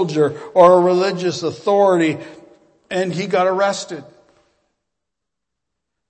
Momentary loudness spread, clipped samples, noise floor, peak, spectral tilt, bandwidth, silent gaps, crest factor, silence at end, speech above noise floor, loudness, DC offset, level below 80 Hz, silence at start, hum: 15 LU; under 0.1%; -82 dBFS; 0 dBFS; -5.5 dB/octave; 8.8 kHz; none; 18 dB; 2.05 s; 66 dB; -16 LUFS; under 0.1%; -66 dBFS; 0 s; none